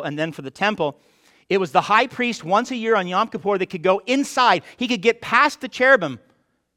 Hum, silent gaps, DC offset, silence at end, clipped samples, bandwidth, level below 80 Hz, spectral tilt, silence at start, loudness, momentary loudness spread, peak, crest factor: none; none; under 0.1%; 0.6 s; under 0.1%; 15.5 kHz; -66 dBFS; -4 dB/octave; 0 s; -20 LUFS; 9 LU; -2 dBFS; 20 dB